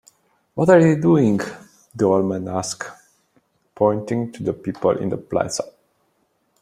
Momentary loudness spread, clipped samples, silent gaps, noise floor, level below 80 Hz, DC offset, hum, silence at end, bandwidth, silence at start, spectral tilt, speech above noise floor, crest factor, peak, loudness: 17 LU; under 0.1%; none; -67 dBFS; -58 dBFS; under 0.1%; none; 0.95 s; 13.5 kHz; 0.55 s; -6.5 dB/octave; 48 dB; 18 dB; -2 dBFS; -20 LUFS